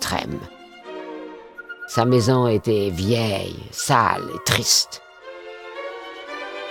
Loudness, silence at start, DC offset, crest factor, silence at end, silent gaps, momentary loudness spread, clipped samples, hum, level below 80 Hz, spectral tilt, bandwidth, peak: -20 LUFS; 0 s; under 0.1%; 22 dB; 0 s; none; 20 LU; under 0.1%; none; -50 dBFS; -4 dB/octave; 18 kHz; 0 dBFS